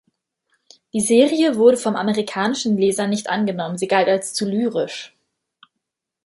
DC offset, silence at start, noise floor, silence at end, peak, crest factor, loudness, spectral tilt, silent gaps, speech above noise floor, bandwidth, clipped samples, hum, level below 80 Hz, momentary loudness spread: under 0.1%; 0.95 s; -80 dBFS; 1.2 s; -2 dBFS; 18 dB; -19 LUFS; -4.5 dB/octave; none; 62 dB; 11.5 kHz; under 0.1%; none; -66 dBFS; 10 LU